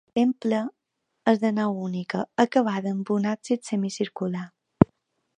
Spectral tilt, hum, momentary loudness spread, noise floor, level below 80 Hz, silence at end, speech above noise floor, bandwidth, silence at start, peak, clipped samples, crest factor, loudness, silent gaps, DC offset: -6.5 dB/octave; none; 8 LU; -70 dBFS; -54 dBFS; 0.55 s; 45 dB; 10 kHz; 0.15 s; 0 dBFS; under 0.1%; 24 dB; -25 LUFS; none; under 0.1%